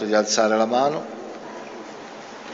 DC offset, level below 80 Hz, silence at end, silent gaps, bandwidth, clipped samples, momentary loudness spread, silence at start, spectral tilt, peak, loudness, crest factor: under 0.1%; -76 dBFS; 0 s; none; 8 kHz; under 0.1%; 18 LU; 0 s; -3 dB/octave; -6 dBFS; -20 LUFS; 16 dB